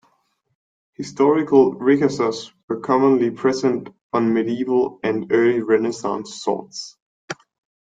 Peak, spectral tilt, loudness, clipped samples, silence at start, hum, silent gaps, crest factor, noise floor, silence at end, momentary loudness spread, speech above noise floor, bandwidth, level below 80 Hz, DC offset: -2 dBFS; -6 dB/octave; -19 LUFS; under 0.1%; 1 s; none; 2.63-2.68 s, 4.01-4.10 s, 7.02-7.28 s; 18 dB; -66 dBFS; 0.55 s; 17 LU; 47 dB; 9.2 kHz; -64 dBFS; under 0.1%